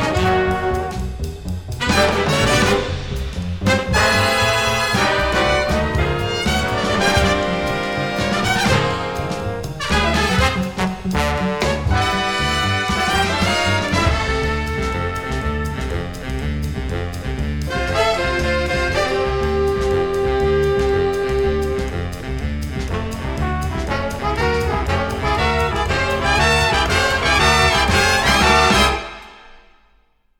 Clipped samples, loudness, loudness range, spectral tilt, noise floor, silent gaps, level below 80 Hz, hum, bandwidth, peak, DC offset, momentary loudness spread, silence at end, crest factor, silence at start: under 0.1%; -18 LUFS; 7 LU; -4.5 dB/octave; -57 dBFS; none; -28 dBFS; none; 18.5 kHz; -2 dBFS; under 0.1%; 11 LU; 0.8 s; 16 dB; 0 s